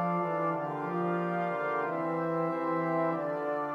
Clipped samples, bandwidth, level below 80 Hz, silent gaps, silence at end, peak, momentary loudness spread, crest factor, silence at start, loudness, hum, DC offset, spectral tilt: under 0.1%; 6.6 kHz; -80 dBFS; none; 0 s; -18 dBFS; 3 LU; 12 dB; 0 s; -31 LUFS; none; under 0.1%; -9 dB/octave